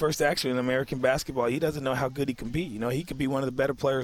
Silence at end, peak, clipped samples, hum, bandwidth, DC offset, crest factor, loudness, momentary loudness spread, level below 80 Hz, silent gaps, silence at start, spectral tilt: 0 s; -12 dBFS; under 0.1%; none; 17 kHz; under 0.1%; 16 dB; -28 LUFS; 5 LU; -50 dBFS; none; 0 s; -5 dB/octave